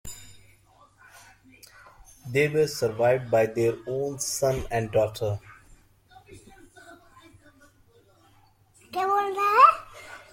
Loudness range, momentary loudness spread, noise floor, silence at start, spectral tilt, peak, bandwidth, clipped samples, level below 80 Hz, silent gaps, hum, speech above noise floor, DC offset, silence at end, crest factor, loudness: 9 LU; 19 LU; -60 dBFS; 0.05 s; -4.5 dB/octave; -4 dBFS; 16.5 kHz; under 0.1%; -54 dBFS; none; none; 35 dB; under 0.1%; 0.15 s; 24 dB; -24 LUFS